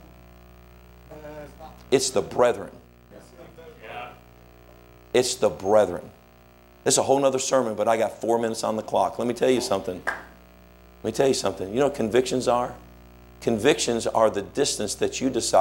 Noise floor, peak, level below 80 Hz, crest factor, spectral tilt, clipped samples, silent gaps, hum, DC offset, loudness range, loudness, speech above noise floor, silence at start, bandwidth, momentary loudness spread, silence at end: -52 dBFS; -6 dBFS; -54 dBFS; 20 dB; -3.5 dB/octave; under 0.1%; none; 60 Hz at -55 dBFS; under 0.1%; 5 LU; -24 LUFS; 29 dB; 1.1 s; 16.5 kHz; 18 LU; 0 s